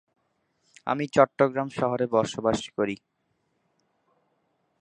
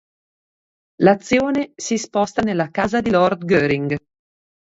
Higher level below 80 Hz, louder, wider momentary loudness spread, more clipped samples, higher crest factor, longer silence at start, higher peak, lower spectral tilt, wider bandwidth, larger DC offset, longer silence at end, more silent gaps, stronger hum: second, -62 dBFS vs -50 dBFS; second, -25 LUFS vs -19 LUFS; about the same, 9 LU vs 7 LU; neither; first, 26 dB vs 20 dB; second, 0.85 s vs 1 s; about the same, -2 dBFS vs 0 dBFS; about the same, -5.5 dB/octave vs -5.5 dB/octave; first, 10 kHz vs 8 kHz; neither; first, 1.85 s vs 0.7 s; neither; neither